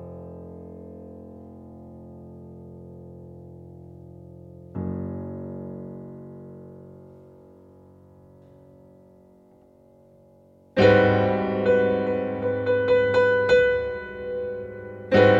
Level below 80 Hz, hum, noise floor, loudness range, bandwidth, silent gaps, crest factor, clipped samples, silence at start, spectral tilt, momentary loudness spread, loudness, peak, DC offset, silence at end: -52 dBFS; none; -55 dBFS; 23 LU; 7.4 kHz; none; 20 dB; under 0.1%; 0 s; -7.5 dB/octave; 26 LU; -22 LUFS; -4 dBFS; under 0.1%; 0 s